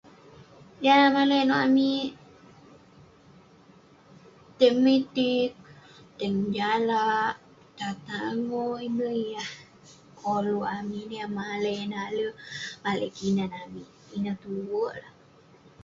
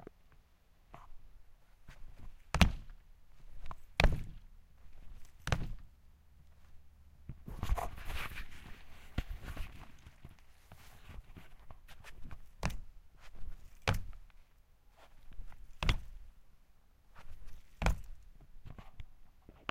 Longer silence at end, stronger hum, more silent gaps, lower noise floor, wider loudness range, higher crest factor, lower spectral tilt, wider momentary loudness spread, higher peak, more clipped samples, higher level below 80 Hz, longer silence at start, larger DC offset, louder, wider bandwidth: first, 0.75 s vs 0 s; neither; neither; second, -56 dBFS vs -65 dBFS; second, 7 LU vs 13 LU; second, 20 dB vs 34 dB; about the same, -5.5 dB/octave vs -5 dB/octave; second, 15 LU vs 25 LU; about the same, -8 dBFS vs -6 dBFS; neither; second, -66 dBFS vs -44 dBFS; first, 0.4 s vs 0 s; neither; first, -27 LUFS vs -39 LUFS; second, 7.6 kHz vs 16 kHz